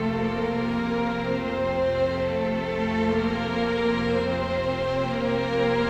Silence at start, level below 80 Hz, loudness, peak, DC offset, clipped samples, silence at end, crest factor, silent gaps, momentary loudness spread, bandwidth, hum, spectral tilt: 0 s; -44 dBFS; -25 LUFS; -12 dBFS; under 0.1%; under 0.1%; 0 s; 12 dB; none; 2 LU; 8.8 kHz; none; -7 dB/octave